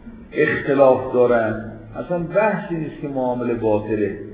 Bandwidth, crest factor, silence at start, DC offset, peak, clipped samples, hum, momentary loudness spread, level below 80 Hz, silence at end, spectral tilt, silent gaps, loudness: 4 kHz; 20 dB; 0.05 s; under 0.1%; 0 dBFS; under 0.1%; none; 12 LU; -48 dBFS; 0 s; -11 dB/octave; none; -20 LUFS